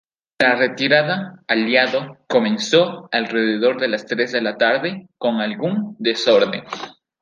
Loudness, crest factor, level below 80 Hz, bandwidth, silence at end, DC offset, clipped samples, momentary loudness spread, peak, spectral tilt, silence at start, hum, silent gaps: -19 LUFS; 18 dB; -68 dBFS; 9.6 kHz; 0.3 s; under 0.1%; under 0.1%; 9 LU; -2 dBFS; -4.5 dB/octave; 0.4 s; none; none